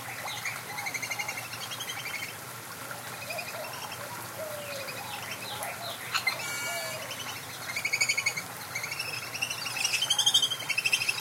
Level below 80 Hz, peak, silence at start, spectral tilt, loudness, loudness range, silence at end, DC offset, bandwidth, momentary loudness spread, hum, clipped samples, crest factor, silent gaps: -76 dBFS; -10 dBFS; 0 s; -0.5 dB/octave; -31 LUFS; 9 LU; 0 s; under 0.1%; 17 kHz; 12 LU; none; under 0.1%; 24 dB; none